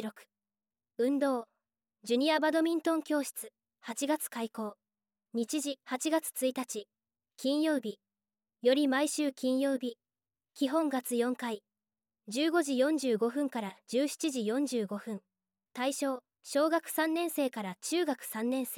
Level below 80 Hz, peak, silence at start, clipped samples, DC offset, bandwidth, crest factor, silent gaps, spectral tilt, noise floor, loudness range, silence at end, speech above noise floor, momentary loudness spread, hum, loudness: -88 dBFS; -16 dBFS; 0 s; under 0.1%; under 0.1%; 17 kHz; 18 dB; none; -3.5 dB/octave; under -90 dBFS; 3 LU; 0 s; over 58 dB; 13 LU; none; -32 LUFS